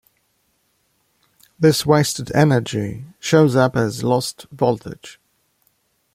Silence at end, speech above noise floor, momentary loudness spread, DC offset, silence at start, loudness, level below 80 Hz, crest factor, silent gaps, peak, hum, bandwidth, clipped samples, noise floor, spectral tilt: 1 s; 48 dB; 14 LU; under 0.1%; 1.6 s; -18 LUFS; -54 dBFS; 18 dB; none; -2 dBFS; none; 16 kHz; under 0.1%; -66 dBFS; -5.5 dB/octave